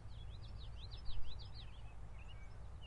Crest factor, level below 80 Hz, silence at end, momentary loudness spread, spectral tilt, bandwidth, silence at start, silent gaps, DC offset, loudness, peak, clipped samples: 16 dB; -52 dBFS; 0 s; 4 LU; -5.5 dB/octave; 9.2 kHz; 0 s; none; under 0.1%; -54 LUFS; -28 dBFS; under 0.1%